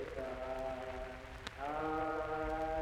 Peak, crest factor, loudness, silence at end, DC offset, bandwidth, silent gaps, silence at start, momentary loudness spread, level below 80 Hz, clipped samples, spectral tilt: -22 dBFS; 18 dB; -41 LUFS; 0 s; under 0.1%; 16 kHz; none; 0 s; 9 LU; -52 dBFS; under 0.1%; -6 dB/octave